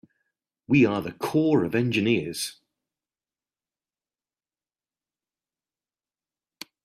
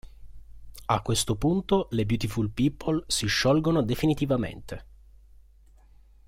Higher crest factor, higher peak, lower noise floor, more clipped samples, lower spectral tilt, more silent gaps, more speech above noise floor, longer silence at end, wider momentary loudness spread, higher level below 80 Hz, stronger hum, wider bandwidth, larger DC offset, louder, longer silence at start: about the same, 20 dB vs 20 dB; about the same, -8 dBFS vs -8 dBFS; first, under -90 dBFS vs -55 dBFS; neither; about the same, -6 dB/octave vs -5 dB/octave; neither; first, over 67 dB vs 29 dB; first, 4.3 s vs 1.45 s; about the same, 12 LU vs 11 LU; second, -66 dBFS vs -46 dBFS; neither; about the same, 15 kHz vs 16.5 kHz; neither; about the same, -24 LUFS vs -26 LUFS; first, 0.7 s vs 0.05 s